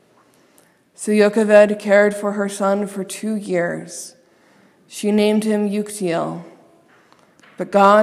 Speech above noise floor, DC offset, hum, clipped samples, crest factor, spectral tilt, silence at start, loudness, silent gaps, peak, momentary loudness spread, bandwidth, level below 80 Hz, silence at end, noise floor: 38 dB; under 0.1%; none; under 0.1%; 18 dB; -5.5 dB/octave; 1 s; -18 LUFS; none; 0 dBFS; 18 LU; 14 kHz; -70 dBFS; 0 s; -55 dBFS